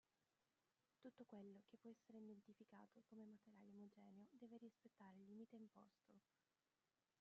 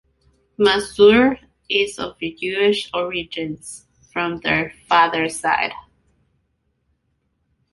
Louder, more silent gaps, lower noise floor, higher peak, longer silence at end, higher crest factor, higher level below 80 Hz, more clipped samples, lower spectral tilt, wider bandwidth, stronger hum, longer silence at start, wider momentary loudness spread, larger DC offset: second, -66 LUFS vs -19 LUFS; neither; first, under -90 dBFS vs -69 dBFS; second, -52 dBFS vs -2 dBFS; second, 1 s vs 1.95 s; about the same, 16 dB vs 18 dB; second, under -90 dBFS vs -52 dBFS; neither; first, -7 dB/octave vs -4 dB/octave; second, 6.2 kHz vs 11.5 kHz; neither; second, 0.2 s vs 0.6 s; second, 5 LU vs 16 LU; neither